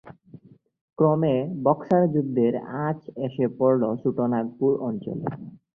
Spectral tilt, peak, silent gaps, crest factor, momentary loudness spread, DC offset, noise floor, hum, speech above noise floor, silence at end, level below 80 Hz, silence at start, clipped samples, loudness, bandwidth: -11 dB/octave; -6 dBFS; 0.81-0.88 s; 18 dB; 10 LU; under 0.1%; -50 dBFS; none; 26 dB; 0.2 s; -64 dBFS; 0.05 s; under 0.1%; -24 LUFS; 3.5 kHz